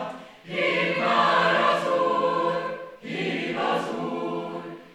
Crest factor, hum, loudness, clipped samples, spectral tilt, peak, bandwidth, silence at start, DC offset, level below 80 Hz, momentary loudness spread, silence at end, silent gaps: 18 dB; none; -24 LUFS; under 0.1%; -5 dB/octave; -8 dBFS; 12.5 kHz; 0 s; under 0.1%; -74 dBFS; 15 LU; 0.05 s; none